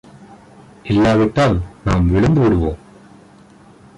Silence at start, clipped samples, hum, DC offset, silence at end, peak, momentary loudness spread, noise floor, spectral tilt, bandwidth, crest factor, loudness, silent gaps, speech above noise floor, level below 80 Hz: 0.85 s; under 0.1%; none; under 0.1%; 1.2 s; -4 dBFS; 10 LU; -45 dBFS; -8 dB/octave; 11 kHz; 12 dB; -16 LUFS; none; 31 dB; -30 dBFS